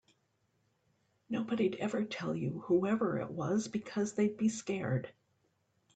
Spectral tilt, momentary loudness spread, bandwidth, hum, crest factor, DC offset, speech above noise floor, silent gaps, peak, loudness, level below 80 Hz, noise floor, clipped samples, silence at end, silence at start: -6 dB/octave; 6 LU; 9 kHz; none; 16 dB; under 0.1%; 43 dB; none; -18 dBFS; -35 LUFS; -74 dBFS; -77 dBFS; under 0.1%; 0.85 s; 1.3 s